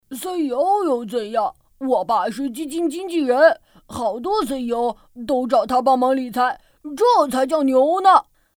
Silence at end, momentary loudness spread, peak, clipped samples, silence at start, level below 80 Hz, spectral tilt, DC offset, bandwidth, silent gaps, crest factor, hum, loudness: 0.35 s; 12 LU; -2 dBFS; under 0.1%; 0.1 s; -56 dBFS; -4 dB/octave; under 0.1%; 19.5 kHz; none; 18 dB; none; -19 LUFS